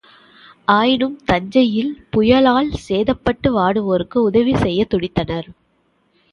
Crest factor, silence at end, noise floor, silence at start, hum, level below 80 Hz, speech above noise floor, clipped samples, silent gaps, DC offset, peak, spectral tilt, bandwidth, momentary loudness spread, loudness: 16 dB; 0.8 s; -62 dBFS; 0.7 s; none; -40 dBFS; 46 dB; under 0.1%; none; under 0.1%; 0 dBFS; -7 dB/octave; 10 kHz; 8 LU; -17 LUFS